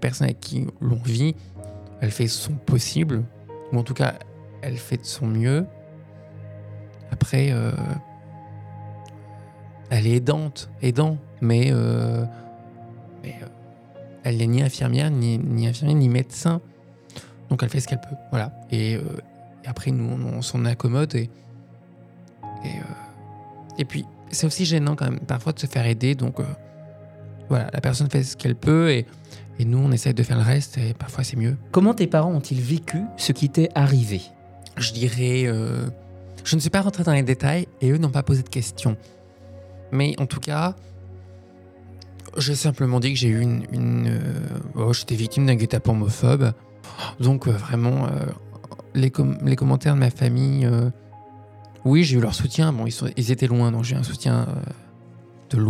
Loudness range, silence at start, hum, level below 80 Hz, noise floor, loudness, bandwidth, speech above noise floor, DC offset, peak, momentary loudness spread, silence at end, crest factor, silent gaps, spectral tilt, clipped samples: 6 LU; 0 s; none; -52 dBFS; -47 dBFS; -22 LUFS; 14 kHz; 26 dB; under 0.1%; -6 dBFS; 21 LU; 0 s; 18 dB; none; -6 dB/octave; under 0.1%